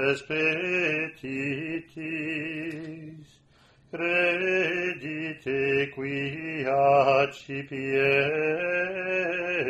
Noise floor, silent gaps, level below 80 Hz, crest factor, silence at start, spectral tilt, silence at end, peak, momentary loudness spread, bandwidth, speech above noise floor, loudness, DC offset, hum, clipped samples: -59 dBFS; none; -64 dBFS; 18 dB; 0 s; -6 dB/octave; 0 s; -8 dBFS; 12 LU; 12 kHz; 32 dB; -26 LUFS; under 0.1%; none; under 0.1%